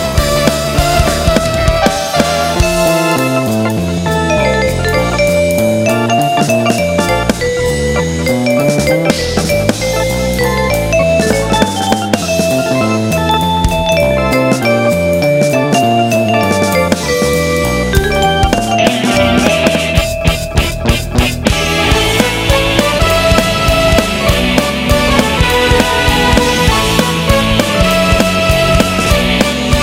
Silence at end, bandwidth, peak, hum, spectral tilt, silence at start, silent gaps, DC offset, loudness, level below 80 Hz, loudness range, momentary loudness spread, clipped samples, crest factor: 0 s; 16.5 kHz; 0 dBFS; none; -4.5 dB/octave; 0 s; none; under 0.1%; -11 LUFS; -22 dBFS; 2 LU; 4 LU; under 0.1%; 12 dB